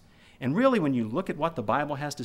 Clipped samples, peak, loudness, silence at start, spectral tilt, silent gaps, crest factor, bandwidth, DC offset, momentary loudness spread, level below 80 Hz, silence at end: under 0.1%; -10 dBFS; -27 LUFS; 0.4 s; -6.5 dB/octave; none; 16 dB; 14 kHz; under 0.1%; 8 LU; -58 dBFS; 0 s